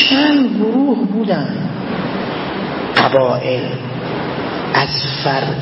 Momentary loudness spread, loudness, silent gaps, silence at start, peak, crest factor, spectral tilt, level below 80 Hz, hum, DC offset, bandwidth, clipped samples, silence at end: 9 LU; -16 LUFS; none; 0 s; 0 dBFS; 16 dB; -7.5 dB/octave; -48 dBFS; none; under 0.1%; 6 kHz; under 0.1%; 0 s